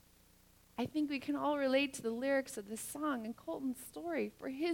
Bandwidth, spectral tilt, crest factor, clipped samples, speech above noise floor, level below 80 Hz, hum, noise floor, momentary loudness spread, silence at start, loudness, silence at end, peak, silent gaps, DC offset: 18 kHz; -4 dB/octave; 18 dB; under 0.1%; 29 dB; -72 dBFS; 60 Hz at -65 dBFS; -66 dBFS; 10 LU; 0.8 s; -38 LUFS; 0 s; -20 dBFS; none; under 0.1%